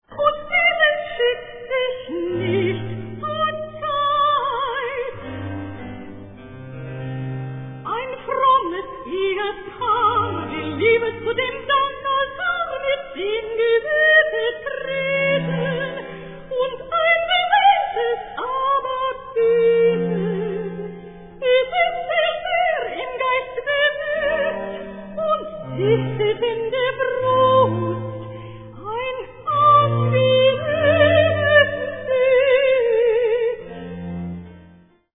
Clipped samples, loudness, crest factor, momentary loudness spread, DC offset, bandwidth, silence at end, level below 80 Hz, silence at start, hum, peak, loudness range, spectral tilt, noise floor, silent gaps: under 0.1%; -20 LUFS; 18 dB; 16 LU; under 0.1%; 4 kHz; 0.45 s; -50 dBFS; 0.1 s; none; -2 dBFS; 7 LU; -9 dB/octave; -50 dBFS; none